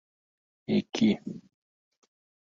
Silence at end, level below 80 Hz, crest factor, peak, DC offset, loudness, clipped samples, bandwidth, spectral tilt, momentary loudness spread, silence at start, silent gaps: 1.15 s; -70 dBFS; 20 dB; -14 dBFS; under 0.1%; -28 LUFS; under 0.1%; 7.2 kHz; -6 dB/octave; 20 LU; 0.7 s; none